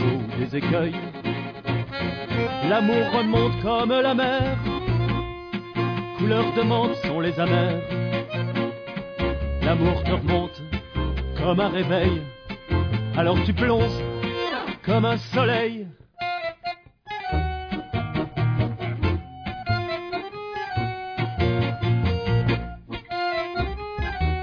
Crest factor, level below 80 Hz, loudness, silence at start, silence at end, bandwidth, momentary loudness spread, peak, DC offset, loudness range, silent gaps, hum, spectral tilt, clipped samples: 16 dB; -36 dBFS; -25 LUFS; 0 s; 0 s; 5.4 kHz; 10 LU; -8 dBFS; under 0.1%; 5 LU; none; none; -8.5 dB/octave; under 0.1%